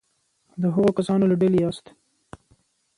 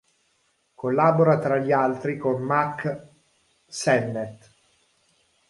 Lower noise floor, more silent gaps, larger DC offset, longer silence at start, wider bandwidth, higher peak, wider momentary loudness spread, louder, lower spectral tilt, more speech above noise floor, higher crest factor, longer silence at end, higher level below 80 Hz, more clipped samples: about the same, -69 dBFS vs -68 dBFS; neither; neither; second, 0.55 s vs 0.85 s; about the same, 11 kHz vs 11.5 kHz; about the same, -8 dBFS vs -6 dBFS; about the same, 14 LU vs 13 LU; about the same, -21 LUFS vs -23 LUFS; first, -8.5 dB/octave vs -6.5 dB/octave; about the same, 49 dB vs 46 dB; about the same, 16 dB vs 20 dB; about the same, 1.2 s vs 1.15 s; first, -58 dBFS vs -66 dBFS; neither